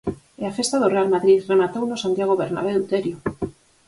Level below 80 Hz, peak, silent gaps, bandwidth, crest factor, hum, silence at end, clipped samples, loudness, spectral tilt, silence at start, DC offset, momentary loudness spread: -54 dBFS; -4 dBFS; none; 11.5 kHz; 16 dB; none; 0.35 s; under 0.1%; -21 LUFS; -5 dB/octave; 0.05 s; under 0.1%; 13 LU